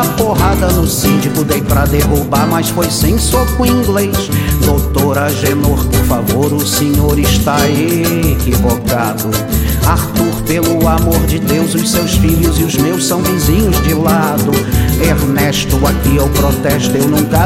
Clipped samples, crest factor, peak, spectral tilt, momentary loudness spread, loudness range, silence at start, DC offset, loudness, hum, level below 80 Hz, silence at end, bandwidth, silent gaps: under 0.1%; 12 dB; 0 dBFS; -5 dB/octave; 2 LU; 1 LU; 0 s; under 0.1%; -12 LUFS; none; -18 dBFS; 0 s; 17 kHz; none